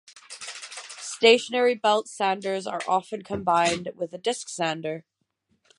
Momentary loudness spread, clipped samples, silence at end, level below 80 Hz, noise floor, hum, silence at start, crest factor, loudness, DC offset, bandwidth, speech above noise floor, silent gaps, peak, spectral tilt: 18 LU; under 0.1%; 0.8 s; -64 dBFS; -72 dBFS; none; 0.15 s; 22 dB; -24 LUFS; under 0.1%; 11.5 kHz; 48 dB; none; -4 dBFS; -3 dB/octave